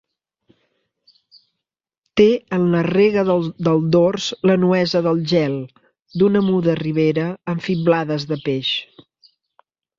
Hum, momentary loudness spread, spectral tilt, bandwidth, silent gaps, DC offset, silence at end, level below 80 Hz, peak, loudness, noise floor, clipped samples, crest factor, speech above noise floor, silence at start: none; 8 LU; -7 dB/octave; 7.6 kHz; none; under 0.1%; 1.15 s; -58 dBFS; -2 dBFS; -18 LUFS; -84 dBFS; under 0.1%; 18 dB; 67 dB; 2.15 s